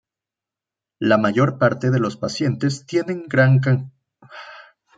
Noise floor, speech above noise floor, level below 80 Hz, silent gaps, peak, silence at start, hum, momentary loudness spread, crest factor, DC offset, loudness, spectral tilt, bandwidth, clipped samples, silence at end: -88 dBFS; 69 dB; -62 dBFS; none; -2 dBFS; 1 s; none; 22 LU; 18 dB; under 0.1%; -19 LUFS; -7 dB/octave; 7.8 kHz; under 0.1%; 0.35 s